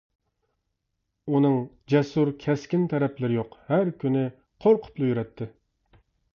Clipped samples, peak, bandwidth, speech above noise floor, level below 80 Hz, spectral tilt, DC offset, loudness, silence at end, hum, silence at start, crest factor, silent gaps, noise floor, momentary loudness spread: under 0.1%; -8 dBFS; 7 kHz; 55 dB; -62 dBFS; -8.5 dB/octave; under 0.1%; -25 LUFS; 0.9 s; none; 1.25 s; 18 dB; none; -79 dBFS; 9 LU